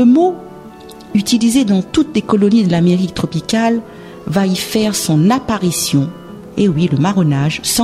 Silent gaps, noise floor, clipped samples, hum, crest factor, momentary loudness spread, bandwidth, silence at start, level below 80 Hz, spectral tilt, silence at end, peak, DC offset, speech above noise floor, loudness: none; -34 dBFS; under 0.1%; none; 14 dB; 13 LU; 16 kHz; 0 s; -44 dBFS; -5.5 dB/octave; 0 s; 0 dBFS; under 0.1%; 21 dB; -14 LUFS